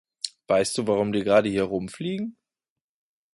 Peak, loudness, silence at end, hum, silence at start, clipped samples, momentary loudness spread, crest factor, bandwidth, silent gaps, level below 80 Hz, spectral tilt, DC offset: -6 dBFS; -25 LUFS; 1 s; none; 0.25 s; under 0.1%; 13 LU; 20 dB; 11.5 kHz; none; -58 dBFS; -5 dB/octave; under 0.1%